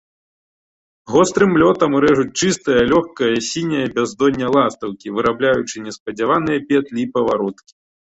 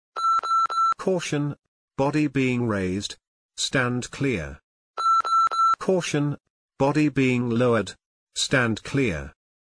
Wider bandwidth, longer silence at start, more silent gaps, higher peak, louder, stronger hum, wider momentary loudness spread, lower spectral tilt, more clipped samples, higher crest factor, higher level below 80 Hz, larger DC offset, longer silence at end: second, 8.2 kHz vs 10.5 kHz; first, 1.05 s vs 0.15 s; second, 6.00-6.06 s vs 1.68-1.88 s, 3.27-3.49 s, 4.63-4.94 s, 6.50-6.69 s, 8.06-8.27 s; first, -2 dBFS vs -8 dBFS; first, -17 LUFS vs -23 LUFS; neither; second, 8 LU vs 14 LU; about the same, -5 dB/octave vs -5 dB/octave; neither; about the same, 16 dB vs 16 dB; about the same, -50 dBFS vs -52 dBFS; neither; about the same, 0.5 s vs 0.5 s